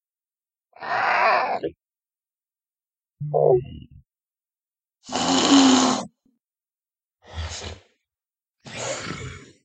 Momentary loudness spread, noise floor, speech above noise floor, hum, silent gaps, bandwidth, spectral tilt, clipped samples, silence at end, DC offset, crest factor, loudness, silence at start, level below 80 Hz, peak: 23 LU; under -90 dBFS; over 68 dB; none; none; 9.2 kHz; -3.5 dB/octave; under 0.1%; 0.2 s; under 0.1%; 24 dB; -21 LUFS; 0.8 s; -50 dBFS; -2 dBFS